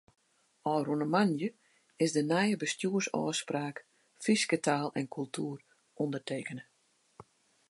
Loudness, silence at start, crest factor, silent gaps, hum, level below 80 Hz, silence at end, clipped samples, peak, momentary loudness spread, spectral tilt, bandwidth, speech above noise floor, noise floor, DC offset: -32 LUFS; 0.65 s; 20 dB; none; none; -82 dBFS; 0.5 s; under 0.1%; -14 dBFS; 11 LU; -4.5 dB/octave; 11.5 kHz; 40 dB; -72 dBFS; under 0.1%